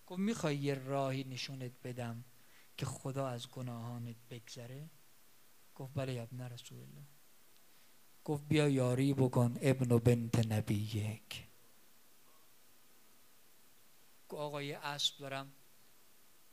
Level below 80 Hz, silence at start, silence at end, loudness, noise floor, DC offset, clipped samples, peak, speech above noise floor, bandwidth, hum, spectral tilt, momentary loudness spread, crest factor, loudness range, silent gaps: -72 dBFS; 0.1 s; 1 s; -37 LUFS; -67 dBFS; under 0.1%; under 0.1%; -14 dBFS; 31 dB; 15.5 kHz; none; -6 dB/octave; 19 LU; 24 dB; 15 LU; none